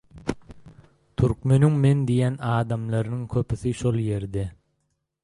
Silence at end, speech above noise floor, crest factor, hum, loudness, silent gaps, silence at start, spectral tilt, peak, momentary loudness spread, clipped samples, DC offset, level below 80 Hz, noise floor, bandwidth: 0.75 s; 52 dB; 18 dB; none; -24 LUFS; none; 0.15 s; -8 dB/octave; -6 dBFS; 14 LU; under 0.1%; under 0.1%; -46 dBFS; -75 dBFS; 11.5 kHz